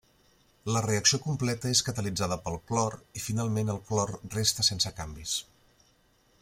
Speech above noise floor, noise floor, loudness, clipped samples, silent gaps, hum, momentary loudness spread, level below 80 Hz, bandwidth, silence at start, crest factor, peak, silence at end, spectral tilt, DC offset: 36 dB; -66 dBFS; -29 LUFS; under 0.1%; none; none; 9 LU; -56 dBFS; 16.5 kHz; 0.65 s; 22 dB; -8 dBFS; 1 s; -3.5 dB/octave; under 0.1%